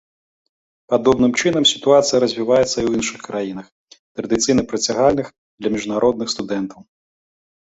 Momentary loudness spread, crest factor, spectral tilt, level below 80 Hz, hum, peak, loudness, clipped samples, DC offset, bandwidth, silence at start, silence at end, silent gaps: 12 LU; 18 dB; -3.5 dB/octave; -50 dBFS; none; -2 dBFS; -18 LUFS; under 0.1%; under 0.1%; 8.2 kHz; 0.9 s; 0.9 s; 3.72-3.88 s, 3.99-4.15 s, 5.38-5.58 s